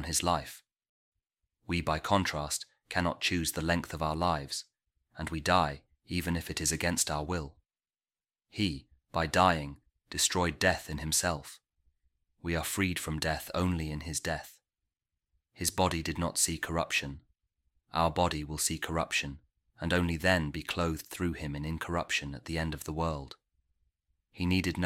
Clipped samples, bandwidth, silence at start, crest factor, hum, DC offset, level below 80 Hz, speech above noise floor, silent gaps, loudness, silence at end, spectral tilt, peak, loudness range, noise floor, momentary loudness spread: under 0.1%; 16.5 kHz; 0 s; 24 dB; none; under 0.1%; -48 dBFS; over 58 dB; 0.89-1.12 s; -31 LUFS; 0 s; -3.5 dB/octave; -10 dBFS; 4 LU; under -90 dBFS; 11 LU